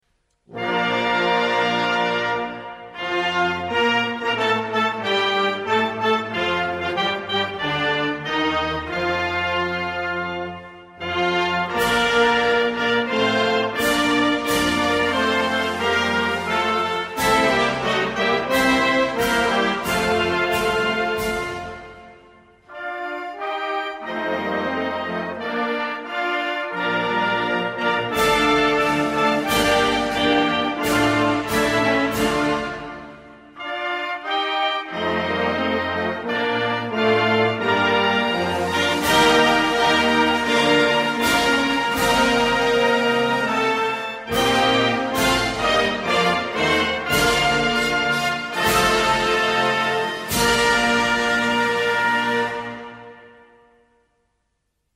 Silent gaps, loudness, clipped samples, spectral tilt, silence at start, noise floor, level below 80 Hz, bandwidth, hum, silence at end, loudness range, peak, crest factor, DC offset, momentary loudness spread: none; -20 LUFS; under 0.1%; -3.5 dB/octave; 0.5 s; -73 dBFS; -46 dBFS; 16 kHz; none; 1.65 s; 6 LU; -4 dBFS; 16 dB; under 0.1%; 8 LU